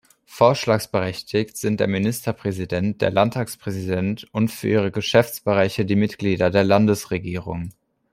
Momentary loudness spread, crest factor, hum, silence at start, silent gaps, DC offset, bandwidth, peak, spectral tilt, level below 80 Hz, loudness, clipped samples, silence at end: 10 LU; 18 dB; none; 0.3 s; none; under 0.1%; 16 kHz; -2 dBFS; -6 dB/octave; -54 dBFS; -21 LUFS; under 0.1%; 0.45 s